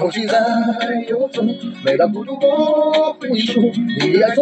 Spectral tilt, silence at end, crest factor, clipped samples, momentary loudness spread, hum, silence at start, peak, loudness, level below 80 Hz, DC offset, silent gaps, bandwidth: -6 dB/octave; 0 s; 14 dB; under 0.1%; 6 LU; none; 0 s; -2 dBFS; -17 LUFS; -70 dBFS; under 0.1%; none; 8.6 kHz